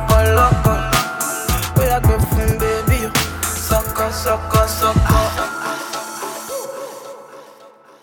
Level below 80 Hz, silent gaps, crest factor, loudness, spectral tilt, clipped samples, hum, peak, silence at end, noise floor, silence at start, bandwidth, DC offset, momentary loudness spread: -24 dBFS; none; 18 dB; -17 LUFS; -4.5 dB/octave; under 0.1%; none; 0 dBFS; 0.35 s; -44 dBFS; 0 s; 19 kHz; under 0.1%; 13 LU